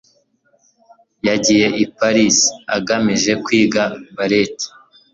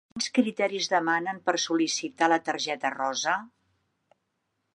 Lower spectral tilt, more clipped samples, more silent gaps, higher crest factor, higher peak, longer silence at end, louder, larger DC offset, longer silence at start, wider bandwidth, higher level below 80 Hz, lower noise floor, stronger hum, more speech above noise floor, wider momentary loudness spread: about the same, -3 dB/octave vs -2.5 dB/octave; neither; neither; about the same, 16 dB vs 20 dB; first, 0 dBFS vs -8 dBFS; second, 0.45 s vs 1.25 s; first, -16 LUFS vs -27 LUFS; neither; first, 1.25 s vs 0.15 s; second, 7.8 kHz vs 11 kHz; first, -54 dBFS vs -76 dBFS; second, -59 dBFS vs -78 dBFS; neither; second, 44 dB vs 51 dB; first, 10 LU vs 4 LU